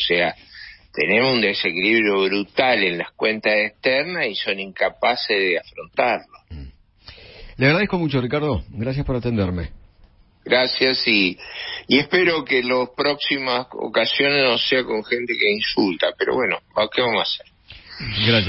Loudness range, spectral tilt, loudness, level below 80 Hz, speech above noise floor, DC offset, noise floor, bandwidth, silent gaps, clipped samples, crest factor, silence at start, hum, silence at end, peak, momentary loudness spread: 4 LU; -8.5 dB/octave; -19 LUFS; -44 dBFS; 32 dB; under 0.1%; -52 dBFS; 5.8 kHz; none; under 0.1%; 18 dB; 0 s; none; 0 s; -2 dBFS; 10 LU